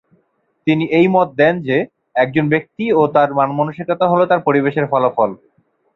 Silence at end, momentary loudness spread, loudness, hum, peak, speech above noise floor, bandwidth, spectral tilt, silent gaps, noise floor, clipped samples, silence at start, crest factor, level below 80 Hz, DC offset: 0.6 s; 6 LU; -16 LUFS; none; -2 dBFS; 49 dB; 6.2 kHz; -9 dB/octave; none; -64 dBFS; under 0.1%; 0.65 s; 14 dB; -58 dBFS; under 0.1%